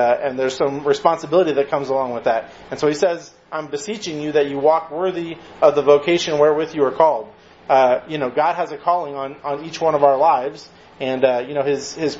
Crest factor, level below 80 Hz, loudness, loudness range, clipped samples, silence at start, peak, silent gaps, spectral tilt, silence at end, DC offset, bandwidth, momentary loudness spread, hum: 18 dB; -60 dBFS; -19 LUFS; 4 LU; under 0.1%; 0 s; 0 dBFS; none; -5 dB/octave; 0 s; under 0.1%; 8 kHz; 12 LU; none